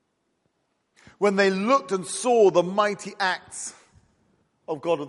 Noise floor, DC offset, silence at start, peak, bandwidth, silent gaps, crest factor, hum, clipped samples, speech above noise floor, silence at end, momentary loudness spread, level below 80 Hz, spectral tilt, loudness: -73 dBFS; under 0.1%; 1.2 s; -6 dBFS; 11.5 kHz; none; 18 dB; none; under 0.1%; 50 dB; 0 s; 16 LU; -74 dBFS; -4 dB/octave; -23 LUFS